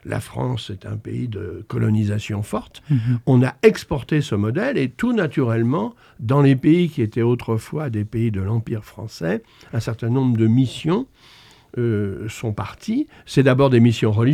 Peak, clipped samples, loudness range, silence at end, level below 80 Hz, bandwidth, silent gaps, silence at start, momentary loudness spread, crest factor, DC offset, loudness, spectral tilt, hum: -2 dBFS; under 0.1%; 4 LU; 0 s; -50 dBFS; 14 kHz; none; 0.05 s; 13 LU; 18 dB; under 0.1%; -20 LUFS; -7.5 dB/octave; none